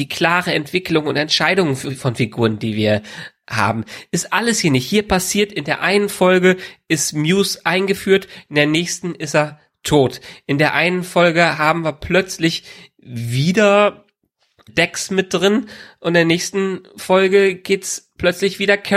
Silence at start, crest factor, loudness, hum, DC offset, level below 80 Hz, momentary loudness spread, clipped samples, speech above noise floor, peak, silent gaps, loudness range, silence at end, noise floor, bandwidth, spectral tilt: 0 s; 16 dB; -17 LUFS; none; under 0.1%; -48 dBFS; 9 LU; under 0.1%; 48 dB; 0 dBFS; none; 2 LU; 0 s; -65 dBFS; 16 kHz; -4.5 dB/octave